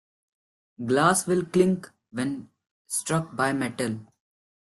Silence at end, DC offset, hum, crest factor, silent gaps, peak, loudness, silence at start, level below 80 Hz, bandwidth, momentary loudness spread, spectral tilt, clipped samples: 0.65 s; under 0.1%; none; 20 dB; 2.71-2.85 s; -6 dBFS; -25 LUFS; 0.8 s; -64 dBFS; 12.5 kHz; 15 LU; -5 dB/octave; under 0.1%